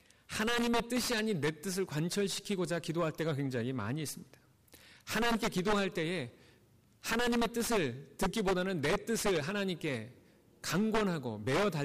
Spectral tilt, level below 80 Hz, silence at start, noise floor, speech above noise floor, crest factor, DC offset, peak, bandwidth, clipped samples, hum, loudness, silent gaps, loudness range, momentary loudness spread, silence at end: -4.5 dB/octave; -56 dBFS; 0.3 s; -65 dBFS; 32 dB; 12 dB; under 0.1%; -22 dBFS; 15.5 kHz; under 0.1%; none; -34 LUFS; none; 3 LU; 7 LU; 0 s